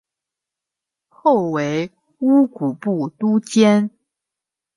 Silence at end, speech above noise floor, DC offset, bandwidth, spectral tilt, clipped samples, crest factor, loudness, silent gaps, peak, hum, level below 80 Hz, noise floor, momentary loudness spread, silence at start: 0.9 s; 69 dB; under 0.1%; 11.5 kHz; -6.5 dB/octave; under 0.1%; 18 dB; -18 LUFS; none; -2 dBFS; none; -68 dBFS; -86 dBFS; 9 LU; 1.25 s